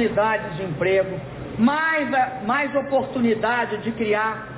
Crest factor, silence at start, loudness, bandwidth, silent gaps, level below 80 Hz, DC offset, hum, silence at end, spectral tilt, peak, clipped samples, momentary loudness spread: 14 dB; 0 s; -22 LUFS; 4 kHz; none; -50 dBFS; under 0.1%; none; 0 s; -9.5 dB/octave; -8 dBFS; under 0.1%; 6 LU